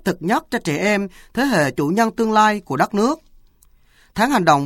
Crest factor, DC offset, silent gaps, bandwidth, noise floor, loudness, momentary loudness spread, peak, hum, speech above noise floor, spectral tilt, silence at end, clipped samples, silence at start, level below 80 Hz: 18 dB; under 0.1%; none; 16.5 kHz; -53 dBFS; -19 LUFS; 7 LU; 0 dBFS; none; 35 dB; -5 dB/octave; 0 s; under 0.1%; 0.05 s; -50 dBFS